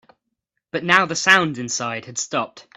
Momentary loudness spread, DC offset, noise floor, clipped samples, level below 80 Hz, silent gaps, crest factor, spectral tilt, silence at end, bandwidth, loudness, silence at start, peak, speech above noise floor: 12 LU; under 0.1%; -78 dBFS; under 0.1%; -64 dBFS; none; 22 dB; -2.5 dB/octave; 0.15 s; 15 kHz; -19 LUFS; 0.75 s; 0 dBFS; 57 dB